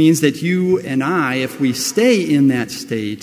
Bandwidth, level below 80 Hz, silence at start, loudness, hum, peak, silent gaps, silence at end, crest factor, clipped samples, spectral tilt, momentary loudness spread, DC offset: 16 kHz; -58 dBFS; 0 s; -16 LUFS; none; 0 dBFS; none; 0 s; 14 dB; under 0.1%; -5 dB/octave; 8 LU; under 0.1%